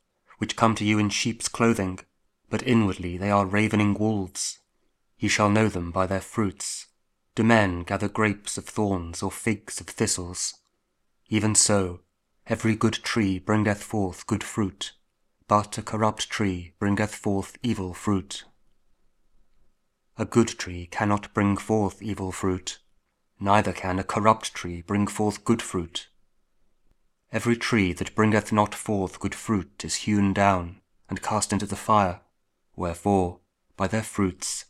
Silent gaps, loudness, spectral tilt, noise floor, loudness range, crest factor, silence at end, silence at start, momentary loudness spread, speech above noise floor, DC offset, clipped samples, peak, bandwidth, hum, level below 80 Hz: none; -25 LUFS; -4.5 dB/octave; -72 dBFS; 4 LU; 24 dB; 0.1 s; 0.4 s; 11 LU; 48 dB; under 0.1%; under 0.1%; -2 dBFS; 14.5 kHz; none; -52 dBFS